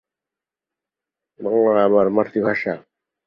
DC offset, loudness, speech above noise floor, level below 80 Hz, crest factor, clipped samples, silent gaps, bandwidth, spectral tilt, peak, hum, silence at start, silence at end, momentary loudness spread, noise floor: under 0.1%; -18 LUFS; 70 dB; -62 dBFS; 18 dB; under 0.1%; none; 5.8 kHz; -9 dB/octave; -4 dBFS; none; 1.4 s; 0.5 s; 13 LU; -88 dBFS